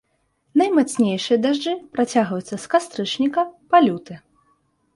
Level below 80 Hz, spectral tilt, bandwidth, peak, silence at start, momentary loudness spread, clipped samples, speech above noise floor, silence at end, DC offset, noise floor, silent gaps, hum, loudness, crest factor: -66 dBFS; -5 dB/octave; 11.5 kHz; -4 dBFS; 0.55 s; 10 LU; under 0.1%; 48 dB; 0.8 s; under 0.1%; -68 dBFS; none; none; -20 LUFS; 18 dB